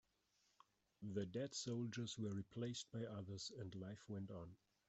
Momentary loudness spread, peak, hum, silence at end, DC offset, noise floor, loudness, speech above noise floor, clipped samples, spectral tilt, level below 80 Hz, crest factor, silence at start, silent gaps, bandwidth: 8 LU; -32 dBFS; none; 0.3 s; under 0.1%; -83 dBFS; -49 LUFS; 34 dB; under 0.1%; -5 dB/octave; -80 dBFS; 18 dB; 1 s; none; 8.2 kHz